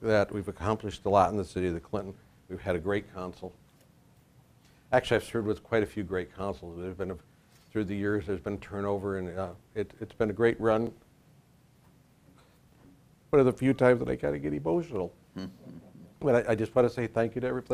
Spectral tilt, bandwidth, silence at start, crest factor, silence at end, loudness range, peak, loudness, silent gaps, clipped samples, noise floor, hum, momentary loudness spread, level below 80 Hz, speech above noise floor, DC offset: -7 dB/octave; 14.5 kHz; 0 s; 22 dB; 0 s; 6 LU; -8 dBFS; -30 LUFS; none; under 0.1%; -61 dBFS; none; 15 LU; -56 dBFS; 32 dB; under 0.1%